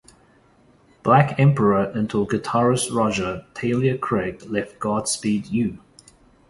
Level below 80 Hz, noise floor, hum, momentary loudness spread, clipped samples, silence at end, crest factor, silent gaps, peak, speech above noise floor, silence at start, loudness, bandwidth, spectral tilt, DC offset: -52 dBFS; -56 dBFS; none; 10 LU; under 0.1%; 0.75 s; 20 dB; none; -2 dBFS; 35 dB; 1.05 s; -21 LUFS; 11.5 kHz; -6 dB/octave; under 0.1%